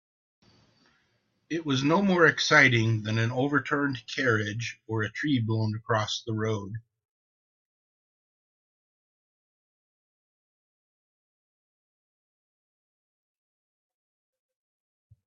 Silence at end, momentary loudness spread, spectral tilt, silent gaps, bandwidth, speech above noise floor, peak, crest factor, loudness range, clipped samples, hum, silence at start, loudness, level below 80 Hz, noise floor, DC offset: 8.45 s; 14 LU; -5 dB/octave; none; 7.4 kHz; 47 dB; -6 dBFS; 24 dB; 11 LU; under 0.1%; none; 1.5 s; -25 LUFS; -66 dBFS; -72 dBFS; under 0.1%